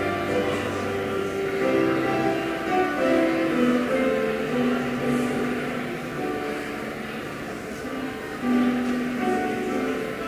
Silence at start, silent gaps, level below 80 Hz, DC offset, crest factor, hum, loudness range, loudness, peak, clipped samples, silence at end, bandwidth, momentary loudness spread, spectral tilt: 0 s; none; -52 dBFS; under 0.1%; 16 dB; none; 5 LU; -25 LUFS; -10 dBFS; under 0.1%; 0 s; 16 kHz; 10 LU; -5.5 dB/octave